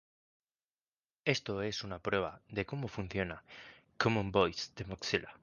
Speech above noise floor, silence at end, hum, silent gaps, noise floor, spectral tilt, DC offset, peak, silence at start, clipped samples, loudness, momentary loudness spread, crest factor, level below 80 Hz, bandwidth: over 54 dB; 0.05 s; none; none; under -90 dBFS; -5 dB/octave; under 0.1%; -12 dBFS; 1.25 s; under 0.1%; -36 LUFS; 10 LU; 26 dB; -58 dBFS; 10 kHz